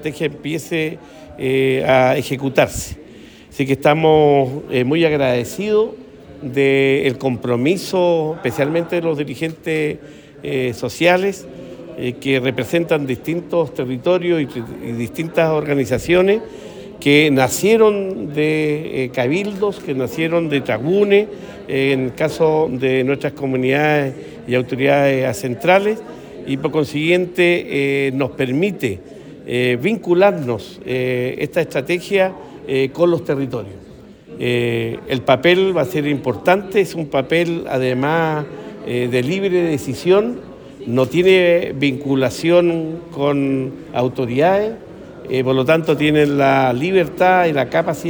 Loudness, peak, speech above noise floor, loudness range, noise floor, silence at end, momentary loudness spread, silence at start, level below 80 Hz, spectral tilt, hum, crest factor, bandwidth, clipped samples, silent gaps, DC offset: -17 LUFS; 0 dBFS; 23 dB; 4 LU; -40 dBFS; 0 s; 11 LU; 0 s; -50 dBFS; -6 dB/octave; none; 16 dB; over 20 kHz; under 0.1%; none; under 0.1%